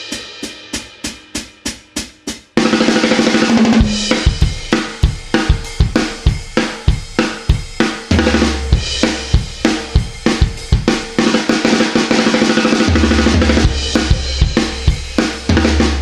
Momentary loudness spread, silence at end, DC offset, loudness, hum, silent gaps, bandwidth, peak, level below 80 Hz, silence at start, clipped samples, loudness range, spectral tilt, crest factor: 12 LU; 0 s; under 0.1%; -15 LUFS; none; none; 12.5 kHz; 0 dBFS; -20 dBFS; 0 s; under 0.1%; 4 LU; -5 dB/octave; 14 dB